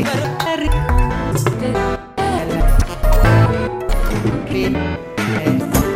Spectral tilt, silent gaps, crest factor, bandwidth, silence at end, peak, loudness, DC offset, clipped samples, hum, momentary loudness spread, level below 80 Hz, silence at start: -6 dB/octave; none; 16 dB; 16 kHz; 0 s; 0 dBFS; -18 LUFS; under 0.1%; under 0.1%; none; 7 LU; -20 dBFS; 0 s